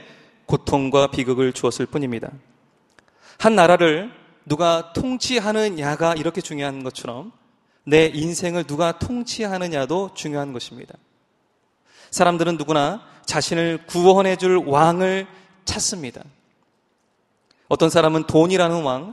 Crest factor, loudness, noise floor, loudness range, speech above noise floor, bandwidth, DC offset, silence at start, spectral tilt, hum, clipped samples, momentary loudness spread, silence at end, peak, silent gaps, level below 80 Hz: 20 dB; -20 LUFS; -66 dBFS; 6 LU; 47 dB; 13 kHz; under 0.1%; 0.5 s; -4.5 dB/octave; none; under 0.1%; 14 LU; 0 s; 0 dBFS; none; -50 dBFS